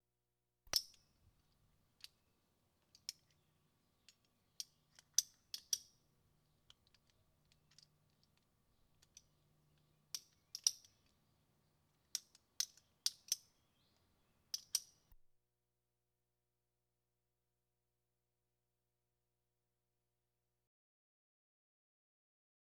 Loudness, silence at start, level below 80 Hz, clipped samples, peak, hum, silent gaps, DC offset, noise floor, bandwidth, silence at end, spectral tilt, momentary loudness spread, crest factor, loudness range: -43 LUFS; 0.75 s; -82 dBFS; under 0.1%; -14 dBFS; 60 Hz at -90 dBFS; none; under 0.1%; under -90 dBFS; 19 kHz; 7.85 s; 2.5 dB/octave; 17 LU; 40 dB; 13 LU